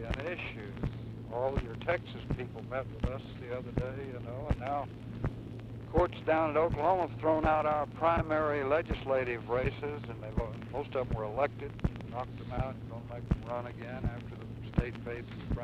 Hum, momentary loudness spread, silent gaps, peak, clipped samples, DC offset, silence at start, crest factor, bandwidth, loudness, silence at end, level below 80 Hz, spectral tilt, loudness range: none; 12 LU; none; -12 dBFS; under 0.1%; under 0.1%; 0 s; 20 dB; 8.8 kHz; -34 LUFS; 0 s; -44 dBFS; -8.5 dB/octave; 8 LU